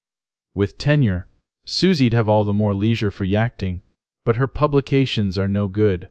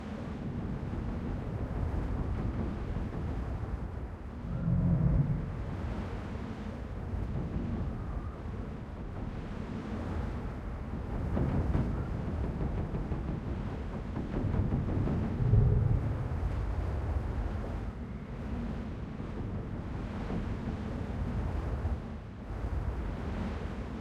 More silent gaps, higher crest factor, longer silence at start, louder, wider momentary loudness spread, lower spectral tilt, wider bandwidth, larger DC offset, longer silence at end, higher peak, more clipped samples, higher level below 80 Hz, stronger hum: neither; about the same, 18 dB vs 20 dB; first, 0.55 s vs 0 s; first, -20 LUFS vs -35 LUFS; about the same, 11 LU vs 10 LU; second, -7.5 dB/octave vs -9 dB/octave; about the same, 8.8 kHz vs 8.4 kHz; neither; about the same, 0.05 s vs 0 s; first, -2 dBFS vs -14 dBFS; neither; second, -44 dBFS vs -38 dBFS; neither